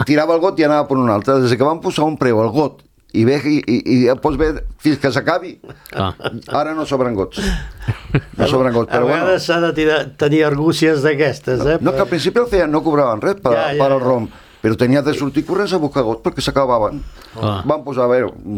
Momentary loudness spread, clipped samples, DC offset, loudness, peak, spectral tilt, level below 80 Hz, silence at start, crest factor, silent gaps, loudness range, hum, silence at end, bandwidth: 8 LU; under 0.1%; under 0.1%; -16 LUFS; 0 dBFS; -6.5 dB/octave; -36 dBFS; 0 s; 16 dB; none; 4 LU; none; 0 s; 15.5 kHz